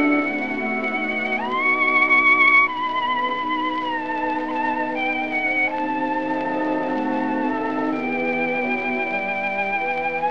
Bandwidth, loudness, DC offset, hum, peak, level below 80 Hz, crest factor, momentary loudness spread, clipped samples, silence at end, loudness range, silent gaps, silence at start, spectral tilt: 7.2 kHz; -20 LUFS; 0.7%; none; -6 dBFS; -62 dBFS; 16 dB; 9 LU; under 0.1%; 0 s; 5 LU; none; 0 s; -5.5 dB/octave